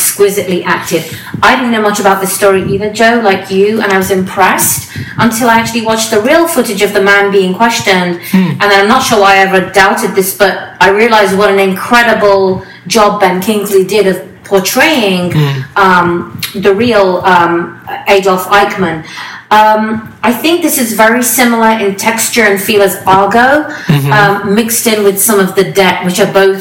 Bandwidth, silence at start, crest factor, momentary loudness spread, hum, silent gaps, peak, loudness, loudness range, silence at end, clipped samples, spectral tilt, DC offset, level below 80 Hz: 18 kHz; 0 s; 8 dB; 6 LU; none; none; 0 dBFS; -8 LUFS; 2 LU; 0 s; 2%; -4 dB/octave; under 0.1%; -42 dBFS